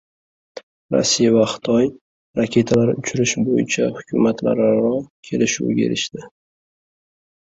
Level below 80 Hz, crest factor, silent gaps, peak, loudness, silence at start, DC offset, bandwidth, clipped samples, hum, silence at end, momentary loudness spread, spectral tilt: -54 dBFS; 18 dB; 0.63-0.89 s, 2.01-2.34 s, 5.10-5.23 s; -2 dBFS; -19 LUFS; 0.55 s; under 0.1%; 8 kHz; under 0.1%; none; 1.3 s; 8 LU; -4.5 dB/octave